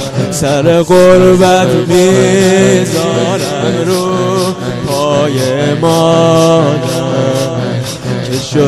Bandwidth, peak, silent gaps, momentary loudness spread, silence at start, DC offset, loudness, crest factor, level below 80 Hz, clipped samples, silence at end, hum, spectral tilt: 14 kHz; 0 dBFS; none; 9 LU; 0 s; under 0.1%; -10 LUFS; 10 dB; -40 dBFS; 0.3%; 0 s; none; -5.5 dB/octave